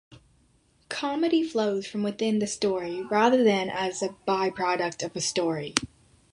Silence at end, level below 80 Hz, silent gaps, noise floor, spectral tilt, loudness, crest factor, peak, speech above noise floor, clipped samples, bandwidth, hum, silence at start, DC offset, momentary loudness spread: 0.45 s; -62 dBFS; none; -64 dBFS; -4 dB/octave; -26 LUFS; 24 dB; -2 dBFS; 38 dB; under 0.1%; 11.5 kHz; none; 0.1 s; under 0.1%; 9 LU